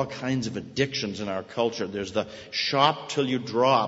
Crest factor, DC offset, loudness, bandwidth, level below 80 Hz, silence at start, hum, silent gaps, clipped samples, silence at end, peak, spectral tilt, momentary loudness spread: 22 dB; under 0.1%; -27 LUFS; 8 kHz; -62 dBFS; 0 s; none; none; under 0.1%; 0 s; -4 dBFS; -4.5 dB/octave; 9 LU